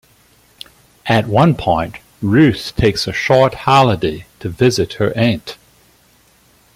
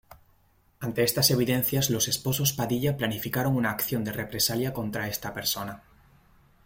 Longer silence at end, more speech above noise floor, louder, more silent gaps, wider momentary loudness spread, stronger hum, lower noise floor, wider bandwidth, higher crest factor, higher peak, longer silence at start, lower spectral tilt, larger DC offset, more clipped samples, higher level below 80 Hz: first, 1.2 s vs 0.85 s; about the same, 38 dB vs 36 dB; first, -15 LUFS vs -26 LUFS; neither; first, 13 LU vs 10 LU; neither; second, -52 dBFS vs -63 dBFS; about the same, 16 kHz vs 16.5 kHz; about the same, 16 dB vs 20 dB; first, 0 dBFS vs -8 dBFS; first, 1.05 s vs 0.1 s; first, -6 dB/octave vs -4 dB/octave; neither; neither; first, -40 dBFS vs -56 dBFS